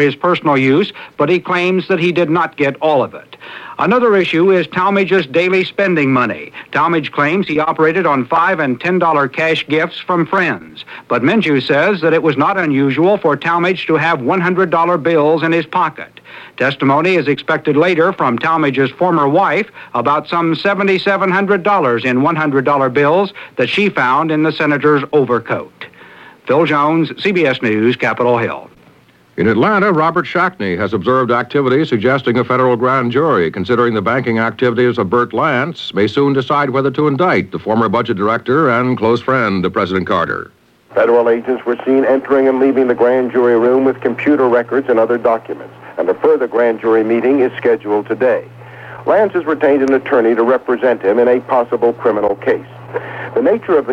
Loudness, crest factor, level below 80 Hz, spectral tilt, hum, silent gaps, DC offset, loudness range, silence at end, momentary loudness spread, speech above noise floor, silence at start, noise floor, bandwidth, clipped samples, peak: -14 LUFS; 12 dB; -56 dBFS; -7.5 dB/octave; none; none; under 0.1%; 2 LU; 0 s; 6 LU; 34 dB; 0 s; -47 dBFS; 8.6 kHz; under 0.1%; -2 dBFS